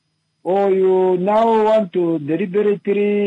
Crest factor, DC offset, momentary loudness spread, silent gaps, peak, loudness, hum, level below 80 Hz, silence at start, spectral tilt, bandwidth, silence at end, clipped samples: 10 dB; under 0.1%; 6 LU; none; -8 dBFS; -17 LUFS; none; -64 dBFS; 0.45 s; -8.5 dB/octave; 7.6 kHz; 0 s; under 0.1%